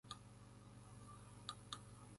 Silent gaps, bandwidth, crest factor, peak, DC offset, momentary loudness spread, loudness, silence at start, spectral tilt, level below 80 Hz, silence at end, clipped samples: none; 11.5 kHz; 26 dB; -32 dBFS; under 0.1%; 8 LU; -56 LUFS; 0.05 s; -3.5 dB/octave; -70 dBFS; 0 s; under 0.1%